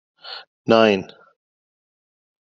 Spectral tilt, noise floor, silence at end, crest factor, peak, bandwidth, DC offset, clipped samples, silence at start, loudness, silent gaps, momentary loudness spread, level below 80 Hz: -3.5 dB/octave; under -90 dBFS; 1.35 s; 22 dB; -2 dBFS; 7.4 kHz; under 0.1%; under 0.1%; 0.25 s; -17 LUFS; 0.47-0.65 s; 20 LU; -66 dBFS